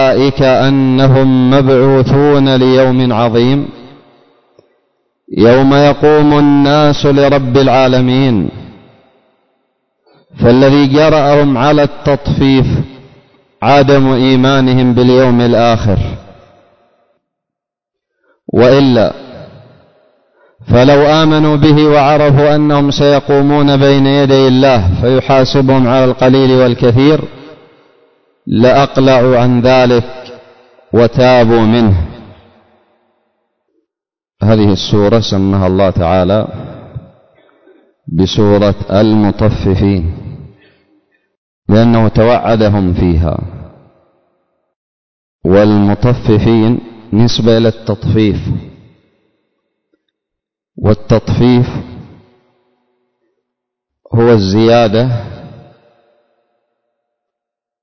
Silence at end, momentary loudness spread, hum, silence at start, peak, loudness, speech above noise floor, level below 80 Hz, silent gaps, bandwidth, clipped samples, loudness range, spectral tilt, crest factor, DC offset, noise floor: 2.2 s; 10 LU; none; 0 s; 0 dBFS; -9 LUFS; 77 dB; -30 dBFS; 41.37-41.62 s, 44.76-45.39 s; 6.4 kHz; under 0.1%; 7 LU; -7.5 dB/octave; 10 dB; under 0.1%; -85 dBFS